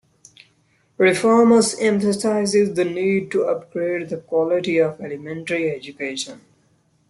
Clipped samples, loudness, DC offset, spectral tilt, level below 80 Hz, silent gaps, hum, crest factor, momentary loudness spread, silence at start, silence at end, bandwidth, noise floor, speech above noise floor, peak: under 0.1%; -20 LUFS; under 0.1%; -4.5 dB/octave; -64 dBFS; none; none; 18 dB; 13 LU; 1 s; 0.7 s; 12 kHz; -62 dBFS; 42 dB; -4 dBFS